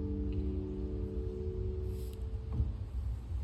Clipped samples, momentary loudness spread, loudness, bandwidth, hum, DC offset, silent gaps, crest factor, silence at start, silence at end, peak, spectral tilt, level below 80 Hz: under 0.1%; 4 LU; -39 LUFS; 13 kHz; none; under 0.1%; none; 16 dB; 0 s; 0 s; -20 dBFS; -9.5 dB/octave; -40 dBFS